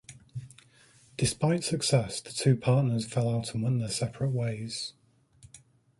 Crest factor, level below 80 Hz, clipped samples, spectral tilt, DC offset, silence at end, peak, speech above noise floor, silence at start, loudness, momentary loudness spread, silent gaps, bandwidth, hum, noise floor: 20 dB; -58 dBFS; under 0.1%; -5.5 dB/octave; under 0.1%; 0.4 s; -10 dBFS; 32 dB; 0.1 s; -29 LUFS; 16 LU; none; 11.5 kHz; none; -60 dBFS